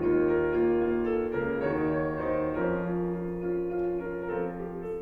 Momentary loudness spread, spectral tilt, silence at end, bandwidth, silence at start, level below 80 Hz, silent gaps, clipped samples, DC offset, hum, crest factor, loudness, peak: 7 LU; -10 dB/octave; 0 s; 4.2 kHz; 0 s; -50 dBFS; none; under 0.1%; under 0.1%; none; 14 dB; -29 LUFS; -16 dBFS